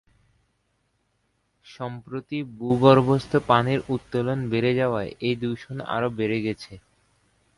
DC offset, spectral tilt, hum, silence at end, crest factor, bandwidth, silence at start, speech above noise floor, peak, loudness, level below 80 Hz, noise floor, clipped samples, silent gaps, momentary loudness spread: under 0.1%; -7.5 dB/octave; none; 0.8 s; 22 dB; 11.5 kHz; 1.7 s; 48 dB; -2 dBFS; -23 LUFS; -56 dBFS; -71 dBFS; under 0.1%; none; 17 LU